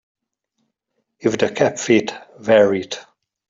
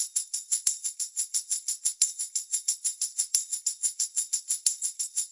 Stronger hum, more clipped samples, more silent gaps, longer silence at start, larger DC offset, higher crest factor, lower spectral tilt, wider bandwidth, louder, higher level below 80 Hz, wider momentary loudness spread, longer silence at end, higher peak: neither; neither; neither; first, 1.25 s vs 0 s; neither; second, 18 dB vs 26 dB; first, -4.5 dB/octave vs 6 dB/octave; second, 7.8 kHz vs 12 kHz; first, -18 LUFS vs -27 LUFS; first, -60 dBFS vs -80 dBFS; first, 16 LU vs 4 LU; first, 0.45 s vs 0 s; first, -2 dBFS vs -6 dBFS